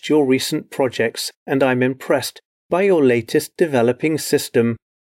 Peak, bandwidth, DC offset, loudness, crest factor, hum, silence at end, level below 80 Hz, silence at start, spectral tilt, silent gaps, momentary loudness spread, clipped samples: -6 dBFS; 16.5 kHz; under 0.1%; -18 LUFS; 12 dB; none; 0.25 s; -66 dBFS; 0.05 s; -5 dB/octave; 1.36-1.46 s, 2.45-2.69 s; 7 LU; under 0.1%